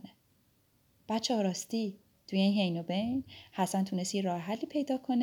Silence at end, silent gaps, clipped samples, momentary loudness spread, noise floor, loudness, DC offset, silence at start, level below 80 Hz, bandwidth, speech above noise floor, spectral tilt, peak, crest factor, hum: 0 s; none; under 0.1%; 8 LU; -70 dBFS; -33 LUFS; under 0.1%; 0.05 s; -72 dBFS; 17 kHz; 38 dB; -5 dB/octave; -16 dBFS; 16 dB; none